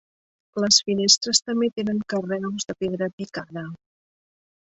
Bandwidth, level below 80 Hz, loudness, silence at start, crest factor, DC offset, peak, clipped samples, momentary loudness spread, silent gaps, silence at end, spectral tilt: 8.4 kHz; -64 dBFS; -21 LUFS; 0.55 s; 22 dB; under 0.1%; -2 dBFS; under 0.1%; 17 LU; 3.13-3.18 s; 0.95 s; -2.5 dB/octave